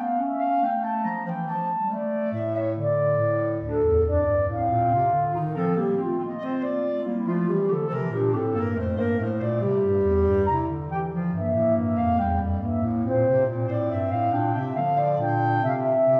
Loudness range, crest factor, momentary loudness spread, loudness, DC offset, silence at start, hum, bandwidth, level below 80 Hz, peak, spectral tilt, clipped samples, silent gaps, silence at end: 2 LU; 12 dB; 5 LU; -24 LUFS; under 0.1%; 0 s; none; 5.2 kHz; -42 dBFS; -10 dBFS; -11 dB/octave; under 0.1%; none; 0 s